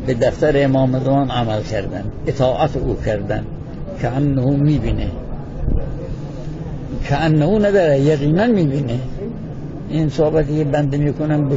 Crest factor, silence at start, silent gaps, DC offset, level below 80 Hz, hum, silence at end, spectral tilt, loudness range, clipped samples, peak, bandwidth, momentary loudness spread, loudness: 14 dB; 0 s; none; under 0.1%; -30 dBFS; none; 0 s; -8 dB/octave; 4 LU; under 0.1%; -4 dBFS; 7.8 kHz; 14 LU; -18 LUFS